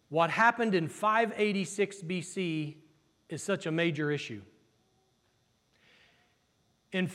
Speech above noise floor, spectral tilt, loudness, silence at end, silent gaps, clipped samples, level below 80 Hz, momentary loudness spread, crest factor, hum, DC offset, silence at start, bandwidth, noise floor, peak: 42 dB; -5 dB/octave; -30 LUFS; 0 s; none; under 0.1%; -82 dBFS; 14 LU; 22 dB; none; under 0.1%; 0.1 s; 14 kHz; -72 dBFS; -10 dBFS